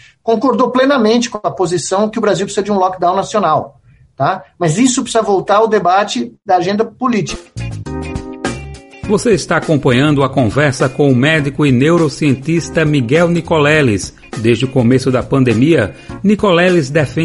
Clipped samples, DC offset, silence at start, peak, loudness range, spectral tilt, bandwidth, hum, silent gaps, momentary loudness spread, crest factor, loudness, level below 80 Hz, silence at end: under 0.1%; under 0.1%; 0.25 s; 0 dBFS; 4 LU; -5.5 dB/octave; 11.5 kHz; none; none; 11 LU; 14 dB; -13 LUFS; -40 dBFS; 0 s